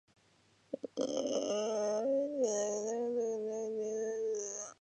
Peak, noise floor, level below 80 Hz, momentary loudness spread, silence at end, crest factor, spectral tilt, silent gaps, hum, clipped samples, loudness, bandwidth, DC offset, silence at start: -22 dBFS; -69 dBFS; -84 dBFS; 5 LU; 0.1 s; 14 dB; -3 dB/octave; none; none; under 0.1%; -36 LUFS; 9.2 kHz; under 0.1%; 0.7 s